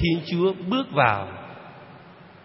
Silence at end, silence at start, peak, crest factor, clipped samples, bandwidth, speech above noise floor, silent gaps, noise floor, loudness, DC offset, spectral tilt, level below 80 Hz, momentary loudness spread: 0.15 s; 0 s; -2 dBFS; 22 dB; under 0.1%; 5.8 kHz; 24 dB; none; -47 dBFS; -23 LUFS; under 0.1%; -10 dB/octave; -48 dBFS; 22 LU